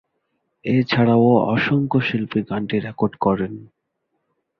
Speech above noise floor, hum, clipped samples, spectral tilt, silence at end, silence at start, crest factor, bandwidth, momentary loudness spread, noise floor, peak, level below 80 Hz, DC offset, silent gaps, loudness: 55 dB; none; under 0.1%; -9 dB/octave; 0.95 s; 0.65 s; 18 dB; 6 kHz; 9 LU; -74 dBFS; -2 dBFS; -54 dBFS; under 0.1%; none; -19 LUFS